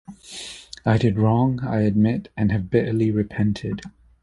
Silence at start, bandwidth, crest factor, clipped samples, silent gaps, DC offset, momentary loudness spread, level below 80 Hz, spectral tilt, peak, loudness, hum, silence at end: 0.1 s; 11.5 kHz; 18 dB; under 0.1%; none; under 0.1%; 15 LU; -44 dBFS; -7.5 dB/octave; -4 dBFS; -22 LUFS; none; 0.35 s